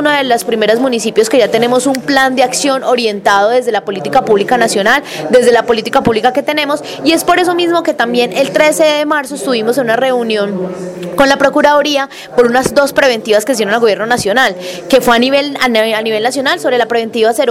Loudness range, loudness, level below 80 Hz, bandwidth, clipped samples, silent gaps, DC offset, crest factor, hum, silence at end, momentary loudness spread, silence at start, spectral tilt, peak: 1 LU; -11 LUFS; -48 dBFS; 17 kHz; under 0.1%; none; under 0.1%; 12 dB; none; 0 s; 5 LU; 0 s; -3.5 dB/octave; 0 dBFS